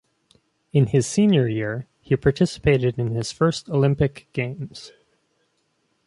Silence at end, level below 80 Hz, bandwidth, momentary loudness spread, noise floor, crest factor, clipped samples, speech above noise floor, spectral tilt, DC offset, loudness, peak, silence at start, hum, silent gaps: 1.2 s; -46 dBFS; 11.5 kHz; 11 LU; -69 dBFS; 18 dB; under 0.1%; 49 dB; -6.5 dB/octave; under 0.1%; -22 LUFS; -4 dBFS; 0.75 s; none; none